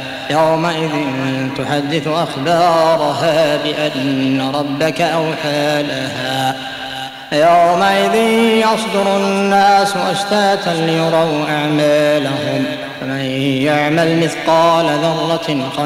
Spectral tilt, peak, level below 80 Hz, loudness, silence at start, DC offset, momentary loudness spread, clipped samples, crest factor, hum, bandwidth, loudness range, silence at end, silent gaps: -5 dB/octave; -2 dBFS; -54 dBFS; -15 LUFS; 0 s; under 0.1%; 8 LU; under 0.1%; 12 dB; none; 16 kHz; 3 LU; 0 s; none